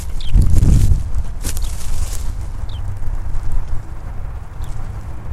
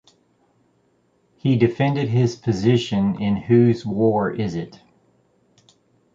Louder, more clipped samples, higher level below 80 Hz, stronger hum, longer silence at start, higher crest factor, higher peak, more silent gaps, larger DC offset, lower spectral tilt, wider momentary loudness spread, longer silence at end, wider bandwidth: about the same, -22 LUFS vs -20 LUFS; neither; first, -18 dBFS vs -52 dBFS; neither; second, 0 s vs 1.45 s; about the same, 14 dB vs 18 dB; first, 0 dBFS vs -4 dBFS; neither; neither; second, -6 dB/octave vs -8 dB/octave; first, 16 LU vs 10 LU; second, 0 s vs 1.45 s; first, 13.5 kHz vs 7.6 kHz